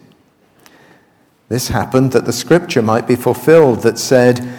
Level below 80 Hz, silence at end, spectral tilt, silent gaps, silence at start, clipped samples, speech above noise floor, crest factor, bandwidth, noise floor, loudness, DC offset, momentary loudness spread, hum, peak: -44 dBFS; 0 s; -5.5 dB/octave; none; 1.5 s; under 0.1%; 41 dB; 14 dB; 19 kHz; -53 dBFS; -13 LUFS; under 0.1%; 8 LU; none; 0 dBFS